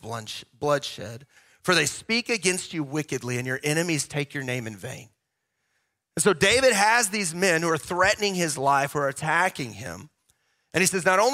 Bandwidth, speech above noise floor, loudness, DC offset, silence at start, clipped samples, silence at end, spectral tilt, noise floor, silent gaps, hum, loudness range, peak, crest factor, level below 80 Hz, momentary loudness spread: 16 kHz; 54 dB; -24 LUFS; under 0.1%; 0.05 s; under 0.1%; 0 s; -3 dB/octave; -79 dBFS; none; none; 7 LU; -4 dBFS; 20 dB; -58 dBFS; 17 LU